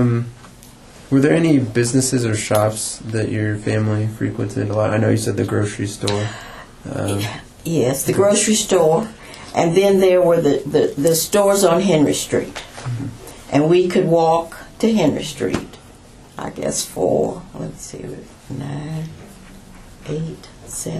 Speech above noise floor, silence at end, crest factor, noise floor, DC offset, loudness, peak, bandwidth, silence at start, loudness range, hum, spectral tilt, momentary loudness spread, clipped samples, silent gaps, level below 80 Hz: 25 dB; 0 s; 18 dB; -43 dBFS; under 0.1%; -18 LUFS; 0 dBFS; 14 kHz; 0 s; 9 LU; none; -5 dB/octave; 17 LU; under 0.1%; none; -46 dBFS